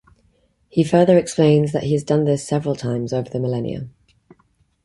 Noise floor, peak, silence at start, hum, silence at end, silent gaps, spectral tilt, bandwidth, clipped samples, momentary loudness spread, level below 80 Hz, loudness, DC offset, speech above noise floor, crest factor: -61 dBFS; -2 dBFS; 0.75 s; none; 0.95 s; none; -7 dB/octave; 11.5 kHz; under 0.1%; 10 LU; -54 dBFS; -19 LUFS; under 0.1%; 44 dB; 18 dB